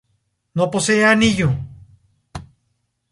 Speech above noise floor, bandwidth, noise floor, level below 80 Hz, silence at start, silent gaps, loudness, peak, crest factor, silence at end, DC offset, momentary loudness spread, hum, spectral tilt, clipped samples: 54 dB; 11.5 kHz; -70 dBFS; -44 dBFS; 0.55 s; none; -17 LUFS; -2 dBFS; 18 dB; 0.7 s; under 0.1%; 24 LU; none; -4.5 dB/octave; under 0.1%